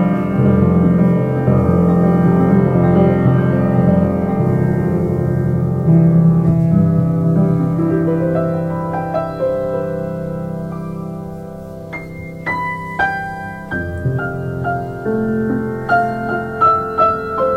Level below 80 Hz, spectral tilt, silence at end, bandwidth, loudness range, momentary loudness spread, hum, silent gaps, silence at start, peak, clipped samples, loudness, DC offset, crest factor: -38 dBFS; -10 dB/octave; 0 s; 5 kHz; 10 LU; 12 LU; none; none; 0 s; -2 dBFS; under 0.1%; -16 LUFS; under 0.1%; 14 dB